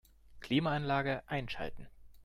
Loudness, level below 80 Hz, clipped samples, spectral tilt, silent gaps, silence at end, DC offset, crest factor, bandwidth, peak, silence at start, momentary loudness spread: -35 LUFS; -56 dBFS; under 0.1%; -7 dB/octave; none; 0 s; under 0.1%; 16 dB; 14.5 kHz; -20 dBFS; 0.3 s; 12 LU